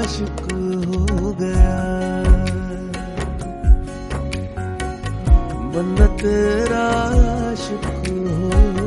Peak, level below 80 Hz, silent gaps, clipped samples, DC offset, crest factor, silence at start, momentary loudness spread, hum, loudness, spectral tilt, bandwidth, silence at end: -2 dBFS; -20 dBFS; none; under 0.1%; under 0.1%; 16 dB; 0 s; 9 LU; none; -20 LUFS; -6.5 dB/octave; 11.5 kHz; 0 s